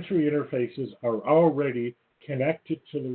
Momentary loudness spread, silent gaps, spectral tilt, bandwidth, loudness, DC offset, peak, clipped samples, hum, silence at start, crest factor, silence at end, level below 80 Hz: 12 LU; none; -12 dB/octave; 4.4 kHz; -26 LUFS; under 0.1%; -10 dBFS; under 0.1%; none; 0 s; 16 dB; 0 s; -70 dBFS